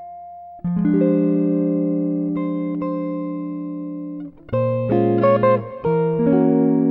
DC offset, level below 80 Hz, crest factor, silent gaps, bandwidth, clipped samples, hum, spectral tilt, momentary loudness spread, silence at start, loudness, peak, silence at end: under 0.1%; -54 dBFS; 14 dB; none; 4.4 kHz; under 0.1%; none; -12 dB/octave; 14 LU; 0 s; -20 LUFS; -4 dBFS; 0 s